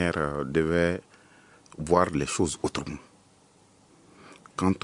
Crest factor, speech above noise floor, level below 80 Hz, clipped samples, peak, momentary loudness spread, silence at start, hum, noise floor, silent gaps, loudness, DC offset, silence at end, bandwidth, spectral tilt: 24 dB; 33 dB; -52 dBFS; under 0.1%; -4 dBFS; 16 LU; 0 s; none; -59 dBFS; none; -27 LUFS; under 0.1%; 0.05 s; 11 kHz; -5.5 dB/octave